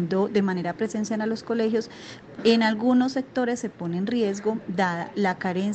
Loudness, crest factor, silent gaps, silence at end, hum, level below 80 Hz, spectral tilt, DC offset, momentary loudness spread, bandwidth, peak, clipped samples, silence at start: -25 LUFS; 18 dB; none; 0 s; none; -66 dBFS; -6 dB/octave; under 0.1%; 8 LU; 8.6 kHz; -6 dBFS; under 0.1%; 0 s